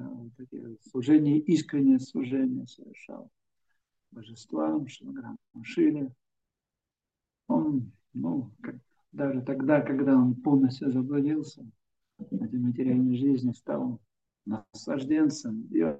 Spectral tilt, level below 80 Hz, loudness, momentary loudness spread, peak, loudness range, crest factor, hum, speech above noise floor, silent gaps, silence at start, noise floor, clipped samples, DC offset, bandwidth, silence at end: -7.5 dB/octave; -76 dBFS; -28 LUFS; 20 LU; -10 dBFS; 7 LU; 18 dB; none; 62 dB; none; 0 s; -89 dBFS; under 0.1%; under 0.1%; 8.2 kHz; 0 s